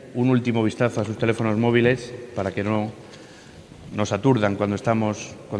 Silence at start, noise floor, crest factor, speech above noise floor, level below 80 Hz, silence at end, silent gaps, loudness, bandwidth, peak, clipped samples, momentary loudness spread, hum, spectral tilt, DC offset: 0 s; -44 dBFS; 18 dB; 22 dB; -56 dBFS; 0 s; none; -23 LUFS; 10.5 kHz; -4 dBFS; under 0.1%; 13 LU; none; -6.5 dB/octave; under 0.1%